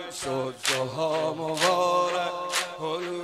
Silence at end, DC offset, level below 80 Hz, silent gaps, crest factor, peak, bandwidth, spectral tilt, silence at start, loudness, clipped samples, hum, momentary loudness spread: 0 s; under 0.1%; -68 dBFS; none; 18 dB; -8 dBFS; 16 kHz; -3 dB/octave; 0 s; -26 LUFS; under 0.1%; none; 8 LU